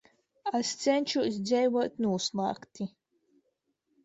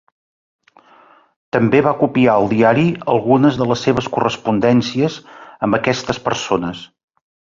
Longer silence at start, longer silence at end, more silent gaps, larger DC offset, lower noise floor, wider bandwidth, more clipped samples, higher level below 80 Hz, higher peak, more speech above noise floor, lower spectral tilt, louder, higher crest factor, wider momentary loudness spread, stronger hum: second, 0.45 s vs 1.55 s; first, 1.15 s vs 0.75 s; neither; neither; first, -78 dBFS vs -49 dBFS; about the same, 8.2 kHz vs 7.6 kHz; neither; second, -74 dBFS vs -50 dBFS; second, -14 dBFS vs -2 dBFS; first, 49 dB vs 33 dB; second, -4.5 dB/octave vs -6.5 dB/octave; second, -30 LUFS vs -16 LUFS; about the same, 18 dB vs 16 dB; first, 12 LU vs 8 LU; neither